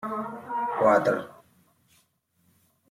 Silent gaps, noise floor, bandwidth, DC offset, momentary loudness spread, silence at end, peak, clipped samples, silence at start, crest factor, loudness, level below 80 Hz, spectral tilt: none; -69 dBFS; 15.5 kHz; under 0.1%; 13 LU; 1.6 s; -8 dBFS; under 0.1%; 0 s; 20 dB; -25 LUFS; -74 dBFS; -6.5 dB/octave